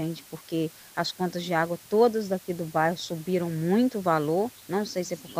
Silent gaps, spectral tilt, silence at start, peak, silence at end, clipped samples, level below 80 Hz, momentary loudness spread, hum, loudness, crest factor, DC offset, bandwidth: none; -5.5 dB/octave; 0 s; -10 dBFS; 0 s; under 0.1%; -68 dBFS; 9 LU; none; -27 LUFS; 18 dB; under 0.1%; 16 kHz